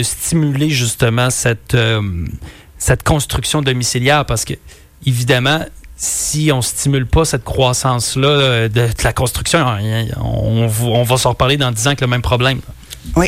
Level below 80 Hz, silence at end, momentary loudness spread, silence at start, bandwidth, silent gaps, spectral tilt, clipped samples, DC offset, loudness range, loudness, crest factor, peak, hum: -30 dBFS; 0 s; 7 LU; 0 s; 16 kHz; none; -4 dB/octave; under 0.1%; under 0.1%; 2 LU; -15 LUFS; 14 dB; -2 dBFS; none